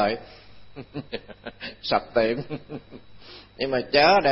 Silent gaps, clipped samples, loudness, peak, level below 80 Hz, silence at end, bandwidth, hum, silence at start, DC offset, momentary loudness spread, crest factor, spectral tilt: none; under 0.1%; -24 LUFS; -6 dBFS; -54 dBFS; 0 s; 6 kHz; none; 0 s; under 0.1%; 26 LU; 20 dB; -8 dB/octave